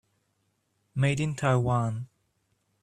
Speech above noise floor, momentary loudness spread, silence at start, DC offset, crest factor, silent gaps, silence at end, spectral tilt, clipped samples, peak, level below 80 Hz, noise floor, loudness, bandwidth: 48 dB; 13 LU; 0.95 s; under 0.1%; 20 dB; none; 0.75 s; -6.5 dB/octave; under 0.1%; -10 dBFS; -58 dBFS; -74 dBFS; -27 LUFS; 10.5 kHz